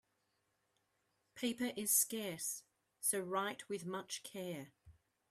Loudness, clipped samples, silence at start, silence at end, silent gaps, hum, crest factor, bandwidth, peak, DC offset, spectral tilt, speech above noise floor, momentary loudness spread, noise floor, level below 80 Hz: -39 LUFS; under 0.1%; 1.35 s; 0.4 s; none; none; 22 dB; 15.5 kHz; -20 dBFS; under 0.1%; -2.5 dB/octave; 42 dB; 14 LU; -83 dBFS; -82 dBFS